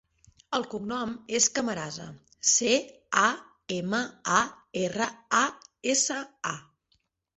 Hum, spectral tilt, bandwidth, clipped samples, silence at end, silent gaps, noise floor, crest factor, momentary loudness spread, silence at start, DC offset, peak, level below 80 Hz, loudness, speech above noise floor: none; -2 dB/octave; 8.2 kHz; under 0.1%; 0.75 s; none; -73 dBFS; 22 dB; 12 LU; 0.5 s; under 0.1%; -6 dBFS; -66 dBFS; -27 LUFS; 45 dB